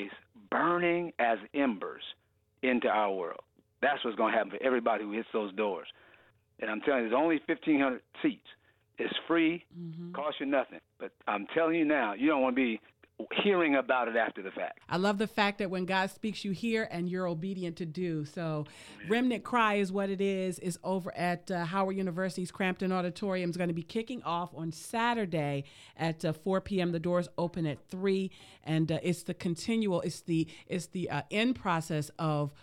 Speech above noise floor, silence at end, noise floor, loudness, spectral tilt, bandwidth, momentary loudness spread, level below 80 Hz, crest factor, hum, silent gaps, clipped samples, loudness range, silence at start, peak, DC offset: 32 dB; 0.1 s; -64 dBFS; -32 LUFS; -6 dB/octave; 15.5 kHz; 11 LU; -68 dBFS; 20 dB; none; none; under 0.1%; 3 LU; 0 s; -12 dBFS; under 0.1%